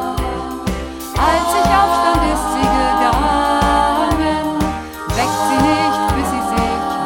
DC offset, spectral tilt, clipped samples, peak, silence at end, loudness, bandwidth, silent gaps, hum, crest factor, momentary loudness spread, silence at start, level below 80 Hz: under 0.1%; -5 dB/octave; under 0.1%; -2 dBFS; 0 s; -16 LUFS; 17.5 kHz; none; none; 12 dB; 9 LU; 0 s; -28 dBFS